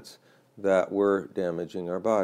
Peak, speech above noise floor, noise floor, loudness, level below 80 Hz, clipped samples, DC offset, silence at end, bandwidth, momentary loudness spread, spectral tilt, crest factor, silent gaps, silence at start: -10 dBFS; 28 dB; -54 dBFS; -27 LUFS; -68 dBFS; under 0.1%; under 0.1%; 0 s; 13.5 kHz; 8 LU; -6.5 dB/octave; 16 dB; none; 0 s